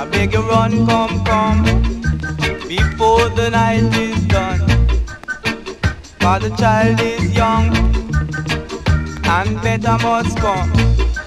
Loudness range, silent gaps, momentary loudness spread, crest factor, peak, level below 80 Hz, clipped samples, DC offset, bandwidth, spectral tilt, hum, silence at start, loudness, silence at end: 1 LU; none; 7 LU; 14 dB; 0 dBFS; -22 dBFS; under 0.1%; under 0.1%; 13.5 kHz; -6 dB/octave; none; 0 s; -16 LUFS; 0 s